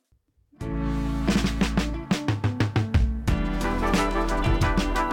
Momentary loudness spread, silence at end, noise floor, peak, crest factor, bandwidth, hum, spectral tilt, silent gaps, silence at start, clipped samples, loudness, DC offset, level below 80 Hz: 4 LU; 0 s; -66 dBFS; -12 dBFS; 14 dB; 16.5 kHz; none; -6 dB/octave; none; 0.6 s; under 0.1%; -25 LUFS; under 0.1%; -30 dBFS